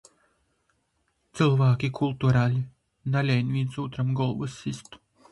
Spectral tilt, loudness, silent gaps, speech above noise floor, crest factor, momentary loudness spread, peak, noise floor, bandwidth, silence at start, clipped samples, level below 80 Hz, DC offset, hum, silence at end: -7.5 dB/octave; -26 LUFS; none; 48 dB; 18 dB; 14 LU; -8 dBFS; -73 dBFS; 11 kHz; 1.35 s; under 0.1%; -56 dBFS; under 0.1%; none; 0.35 s